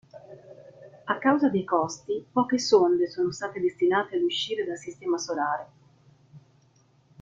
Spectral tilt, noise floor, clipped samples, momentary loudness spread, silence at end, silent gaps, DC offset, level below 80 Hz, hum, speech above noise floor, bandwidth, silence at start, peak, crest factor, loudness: -4.5 dB/octave; -62 dBFS; under 0.1%; 12 LU; 0.85 s; none; under 0.1%; -70 dBFS; none; 37 dB; 7.6 kHz; 0.15 s; -8 dBFS; 20 dB; -26 LUFS